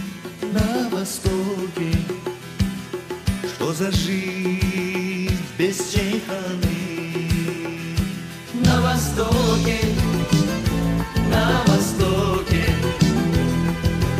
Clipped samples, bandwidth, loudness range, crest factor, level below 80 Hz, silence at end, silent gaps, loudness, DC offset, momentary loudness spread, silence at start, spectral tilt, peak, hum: under 0.1%; 15.5 kHz; 5 LU; 18 dB; -32 dBFS; 0 s; none; -22 LUFS; under 0.1%; 8 LU; 0 s; -5.5 dB/octave; -4 dBFS; none